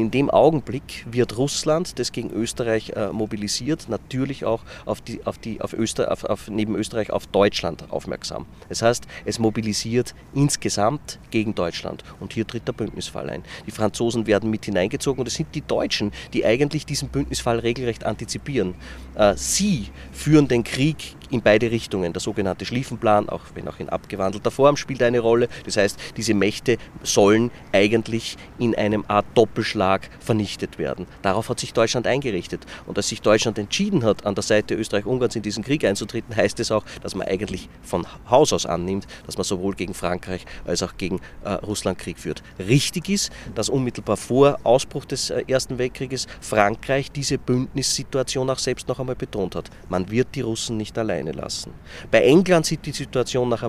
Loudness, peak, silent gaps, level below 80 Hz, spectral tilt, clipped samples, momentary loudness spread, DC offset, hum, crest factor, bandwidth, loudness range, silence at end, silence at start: -23 LUFS; 0 dBFS; none; -46 dBFS; -4.5 dB/octave; under 0.1%; 12 LU; under 0.1%; none; 22 dB; 15.5 kHz; 5 LU; 0 s; 0 s